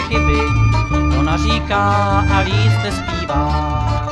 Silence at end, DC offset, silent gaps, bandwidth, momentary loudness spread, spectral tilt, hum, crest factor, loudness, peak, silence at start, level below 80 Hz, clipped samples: 0 s; under 0.1%; none; 10.5 kHz; 4 LU; -6 dB/octave; none; 12 dB; -16 LUFS; -2 dBFS; 0 s; -22 dBFS; under 0.1%